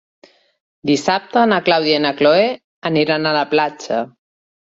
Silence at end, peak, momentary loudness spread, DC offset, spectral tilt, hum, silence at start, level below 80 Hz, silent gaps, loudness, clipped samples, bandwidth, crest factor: 0.7 s; -2 dBFS; 9 LU; under 0.1%; -5 dB/octave; none; 0.85 s; -62 dBFS; 2.64-2.82 s; -16 LUFS; under 0.1%; 8 kHz; 16 dB